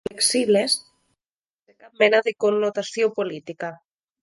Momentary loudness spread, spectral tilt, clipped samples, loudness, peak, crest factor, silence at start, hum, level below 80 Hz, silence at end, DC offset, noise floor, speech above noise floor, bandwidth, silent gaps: 14 LU; -2.5 dB/octave; under 0.1%; -21 LUFS; -2 dBFS; 22 dB; 0.1 s; none; -66 dBFS; 0.45 s; under 0.1%; under -90 dBFS; over 69 dB; 11.5 kHz; 1.30-1.35 s, 1.50-1.54 s